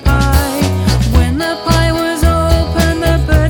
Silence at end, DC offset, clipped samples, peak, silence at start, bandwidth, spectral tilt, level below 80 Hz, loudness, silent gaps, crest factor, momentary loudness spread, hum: 0 s; under 0.1%; under 0.1%; 0 dBFS; 0 s; 17.5 kHz; -5.5 dB/octave; -16 dBFS; -13 LUFS; none; 12 dB; 2 LU; none